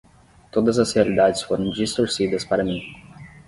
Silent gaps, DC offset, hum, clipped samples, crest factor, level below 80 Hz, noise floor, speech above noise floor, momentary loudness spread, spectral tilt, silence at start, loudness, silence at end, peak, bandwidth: none; under 0.1%; none; under 0.1%; 18 dB; -50 dBFS; -49 dBFS; 29 dB; 9 LU; -5 dB/octave; 0.55 s; -21 LUFS; 0.2 s; -4 dBFS; 11.5 kHz